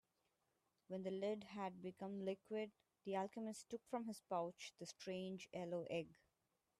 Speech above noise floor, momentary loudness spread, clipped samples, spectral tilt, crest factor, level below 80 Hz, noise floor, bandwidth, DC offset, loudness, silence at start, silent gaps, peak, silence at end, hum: 40 dB; 8 LU; under 0.1%; -5.5 dB/octave; 18 dB; -88 dBFS; -88 dBFS; 13.5 kHz; under 0.1%; -49 LUFS; 0.9 s; none; -32 dBFS; 0.65 s; none